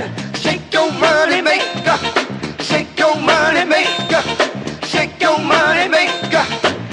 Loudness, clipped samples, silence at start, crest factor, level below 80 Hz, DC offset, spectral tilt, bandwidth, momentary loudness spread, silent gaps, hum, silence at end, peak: -15 LUFS; under 0.1%; 0 s; 16 dB; -48 dBFS; under 0.1%; -3.5 dB/octave; 11 kHz; 7 LU; none; none; 0 s; 0 dBFS